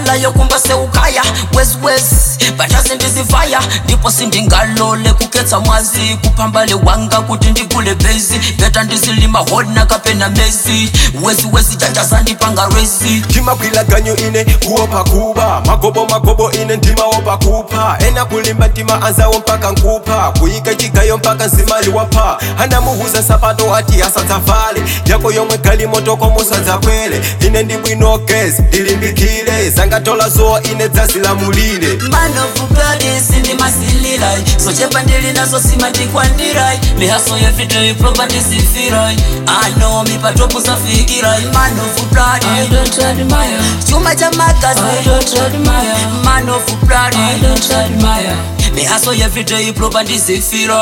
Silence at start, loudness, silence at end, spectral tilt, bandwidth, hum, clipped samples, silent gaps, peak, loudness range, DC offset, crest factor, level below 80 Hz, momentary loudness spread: 0 s; -10 LUFS; 0 s; -3.5 dB/octave; 17.5 kHz; none; under 0.1%; none; 0 dBFS; 1 LU; under 0.1%; 10 dB; -16 dBFS; 3 LU